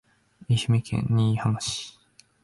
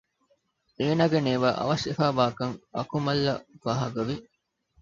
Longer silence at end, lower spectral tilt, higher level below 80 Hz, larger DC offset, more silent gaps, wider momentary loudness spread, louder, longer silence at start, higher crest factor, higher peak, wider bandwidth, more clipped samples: about the same, 0.55 s vs 0.6 s; about the same, -5.5 dB/octave vs -6.5 dB/octave; first, -52 dBFS vs -58 dBFS; neither; neither; about the same, 9 LU vs 9 LU; about the same, -25 LUFS vs -27 LUFS; second, 0.4 s vs 0.8 s; second, 14 dB vs 20 dB; second, -12 dBFS vs -6 dBFS; first, 11.5 kHz vs 7.6 kHz; neither